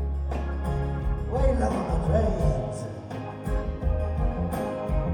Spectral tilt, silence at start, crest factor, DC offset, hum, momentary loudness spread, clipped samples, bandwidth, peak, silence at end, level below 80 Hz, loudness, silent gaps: -8 dB/octave; 0 s; 16 dB; under 0.1%; none; 9 LU; under 0.1%; 13.5 kHz; -10 dBFS; 0 s; -30 dBFS; -28 LUFS; none